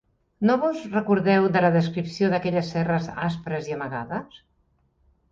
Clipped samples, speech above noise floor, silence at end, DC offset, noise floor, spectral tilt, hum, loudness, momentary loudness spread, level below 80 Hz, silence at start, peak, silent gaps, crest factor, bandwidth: under 0.1%; 43 dB; 0.95 s; under 0.1%; -66 dBFS; -7.5 dB/octave; none; -24 LUFS; 11 LU; -58 dBFS; 0.4 s; -8 dBFS; none; 16 dB; 7.6 kHz